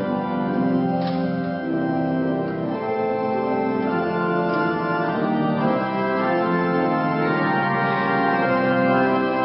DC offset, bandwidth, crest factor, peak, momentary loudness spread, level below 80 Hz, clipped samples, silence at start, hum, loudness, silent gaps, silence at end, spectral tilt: under 0.1%; 5.6 kHz; 14 dB; -8 dBFS; 5 LU; -60 dBFS; under 0.1%; 0 s; none; -21 LUFS; none; 0 s; -12 dB/octave